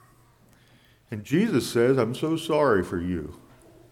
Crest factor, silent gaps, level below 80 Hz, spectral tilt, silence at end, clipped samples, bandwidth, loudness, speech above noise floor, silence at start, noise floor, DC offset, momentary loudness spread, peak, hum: 16 dB; none; -54 dBFS; -6 dB/octave; 0.55 s; under 0.1%; 16.5 kHz; -24 LUFS; 34 dB; 1.1 s; -58 dBFS; under 0.1%; 15 LU; -10 dBFS; none